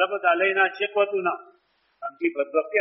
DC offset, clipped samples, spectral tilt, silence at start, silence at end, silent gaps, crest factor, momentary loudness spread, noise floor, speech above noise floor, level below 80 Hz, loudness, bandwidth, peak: under 0.1%; under 0.1%; -0.5 dB/octave; 0 s; 0 s; none; 18 dB; 15 LU; -48 dBFS; 24 dB; -80 dBFS; -23 LUFS; 5.6 kHz; -6 dBFS